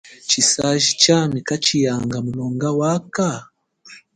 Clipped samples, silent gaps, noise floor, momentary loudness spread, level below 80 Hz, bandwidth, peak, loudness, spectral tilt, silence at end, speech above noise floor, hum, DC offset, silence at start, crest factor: under 0.1%; none; -46 dBFS; 10 LU; -54 dBFS; 11 kHz; 0 dBFS; -18 LUFS; -3.5 dB/octave; 0.2 s; 27 dB; none; under 0.1%; 0.05 s; 20 dB